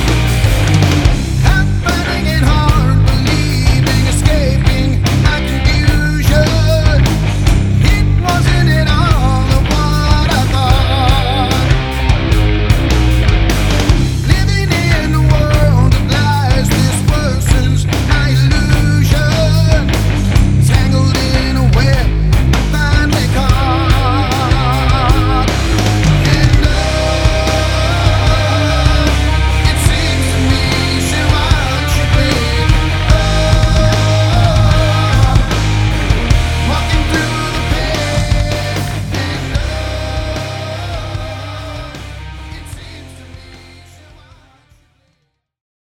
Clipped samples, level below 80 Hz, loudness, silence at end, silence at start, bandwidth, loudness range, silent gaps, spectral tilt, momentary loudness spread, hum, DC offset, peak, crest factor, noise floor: under 0.1%; -16 dBFS; -12 LUFS; 2.35 s; 0 s; 19 kHz; 6 LU; none; -5.5 dB/octave; 7 LU; none; under 0.1%; 0 dBFS; 12 dB; -64 dBFS